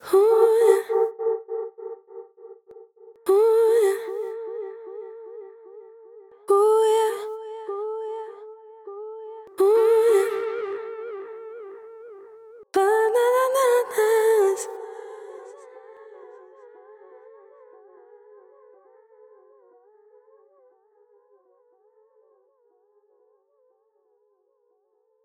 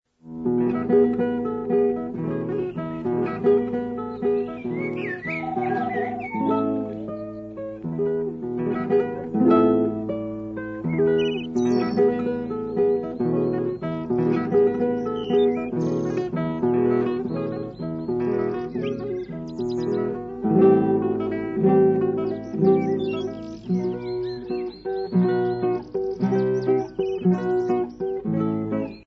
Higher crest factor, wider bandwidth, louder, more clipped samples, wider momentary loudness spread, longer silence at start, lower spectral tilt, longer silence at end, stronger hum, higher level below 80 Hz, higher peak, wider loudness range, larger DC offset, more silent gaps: about the same, 20 dB vs 16 dB; first, 16 kHz vs 6.8 kHz; first, -21 LUFS vs -24 LUFS; neither; first, 26 LU vs 10 LU; second, 0.05 s vs 0.25 s; second, -2 dB/octave vs -9 dB/octave; first, 9.05 s vs 0.05 s; neither; second, -80 dBFS vs -54 dBFS; about the same, -4 dBFS vs -6 dBFS; about the same, 4 LU vs 5 LU; neither; neither